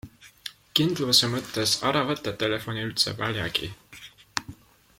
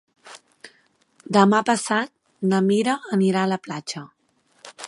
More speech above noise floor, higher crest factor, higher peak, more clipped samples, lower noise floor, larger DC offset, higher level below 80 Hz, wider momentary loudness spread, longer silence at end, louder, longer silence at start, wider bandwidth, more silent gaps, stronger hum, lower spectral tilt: second, 23 dB vs 43 dB; about the same, 26 dB vs 22 dB; about the same, -2 dBFS vs -2 dBFS; neither; second, -48 dBFS vs -64 dBFS; neither; first, -58 dBFS vs -72 dBFS; first, 20 LU vs 16 LU; first, 0.45 s vs 0 s; second, -25 LUFS vs -21 LUFS; second, 0.05 s vs 0.25 s; first, 16.5 kHz vs 11.5 kHz; neither; neither; second, -3.5 dB/octave vs -5.5 dB/octave